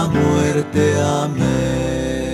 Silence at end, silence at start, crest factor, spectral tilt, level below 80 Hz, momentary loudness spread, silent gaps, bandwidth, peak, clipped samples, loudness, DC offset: 0 s; 0 s; 12 dB; -6 dB/octave; -34 dBFS; 5 LU; none; 14 kHz; -4 dBFS; under 0.1%; -18 LUFS; under 0.1%